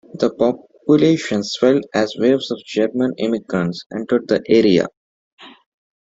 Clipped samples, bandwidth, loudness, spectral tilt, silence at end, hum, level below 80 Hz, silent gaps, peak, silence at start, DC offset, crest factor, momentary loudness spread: under 0.1%; 8 kHz; -18 LUFS; -6 dB/octave; 0.65 s; none; -58 dBFS; 3.86-3.90 s, 4.97-5.37 s; -2 dBFS; 0.15 s; under 0.1%; 16 dB; 8 LU